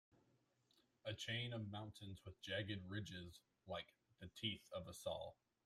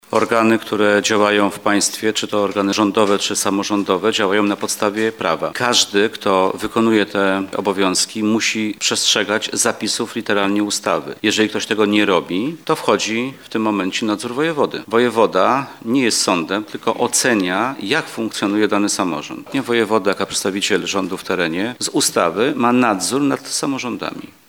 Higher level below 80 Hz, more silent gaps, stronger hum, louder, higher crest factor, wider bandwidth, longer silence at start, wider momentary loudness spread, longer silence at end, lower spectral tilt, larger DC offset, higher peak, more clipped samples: second, -78 dBFS vs -62 dBFS; neither; neither; second, -50 LUFS vs -17 LUFS; about the same, 20 dB vs 16 dB; second, 15 kHz vs 18.5 kHz; first, 1.05 s vs 0.1 s; first, 13 LU vs 6 LU; first, 0.35 s vs 0.2 s; first, -4.5 dB/octave vs -3 dB/octave; neither; second, -30 dBFS vs -2 dBFS; neither